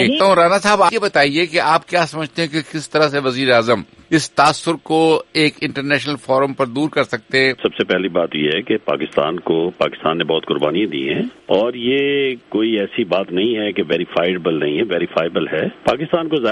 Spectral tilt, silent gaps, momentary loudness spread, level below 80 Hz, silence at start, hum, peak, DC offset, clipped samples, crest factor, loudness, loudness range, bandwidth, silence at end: -4.5 dB/octave; none; 6 LU; -56 dBFS; 0 s; none; -2 dBFS; under 0.1%; under 0.1%; 16 dB; -17 LUFS; 3 LU; 11.5 kHz; 0 s